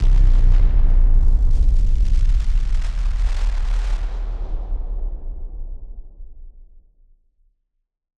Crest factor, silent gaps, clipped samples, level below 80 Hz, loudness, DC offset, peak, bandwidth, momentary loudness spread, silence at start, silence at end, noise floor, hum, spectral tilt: 12 dB; none; under 0.1%; -16 dBFS; -23 LUFS; under 0.1%; -4 dBFS; 4.5 kHz; 17 LU; 0 s; 1.7 s; -73 dBFS; none; -7 dB/octave